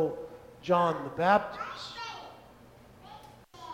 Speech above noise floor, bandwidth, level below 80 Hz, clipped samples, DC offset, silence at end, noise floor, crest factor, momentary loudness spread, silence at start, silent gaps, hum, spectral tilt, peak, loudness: 26 dB; 16 kHz; -64 dBFS; under 0.1%; under 0.1%; 0 s; -54 dBFS; 22 dB; 24 LU; 0 s; none; none; -6 dB/octave; -10 dBFS; -30 LUFS